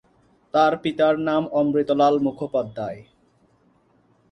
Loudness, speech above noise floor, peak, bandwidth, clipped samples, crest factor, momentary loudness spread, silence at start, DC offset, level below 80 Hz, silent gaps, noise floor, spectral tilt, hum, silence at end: -22 LUFS; 40 dB; -6 dBFS; 8.6 kHz; under 0.1%; 18 dB; 12 LU; 0.55 s; under 0.1%; -62 dBFS; none; -61 dBFS; -7 dB/octave; none; 1.3 s